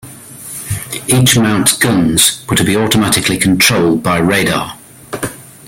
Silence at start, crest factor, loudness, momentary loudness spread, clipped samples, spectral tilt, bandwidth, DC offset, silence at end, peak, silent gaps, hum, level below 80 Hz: 0.05 s; 14 dB; -11 LUFS; 16 LU; under 0.1%; -3.5 dB/octave; over 20 kHz; under 0.1%; 0.15 s; 0 dBFS; none; none; -40 dBFS